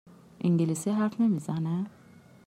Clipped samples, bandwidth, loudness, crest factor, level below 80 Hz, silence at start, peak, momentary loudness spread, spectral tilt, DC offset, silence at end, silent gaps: under 0.1%; 14 kHz; -28 LUFS; 12 dB; -72 dBFS; 0.4 s; -16 dBFS; 7 LU; -7.5 dB/octave; under 0.1%; 0.6 s; none